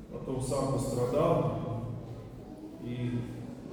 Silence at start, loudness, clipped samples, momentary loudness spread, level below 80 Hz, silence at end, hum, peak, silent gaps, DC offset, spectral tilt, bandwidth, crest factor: 0 s; -33 LUFS; under 0.1%; 17 LU; -52 dBFS; 0 s; none; -14 dBFS; none; under 0.1%; -7 dB/octave; over 20 kHz; 18 dB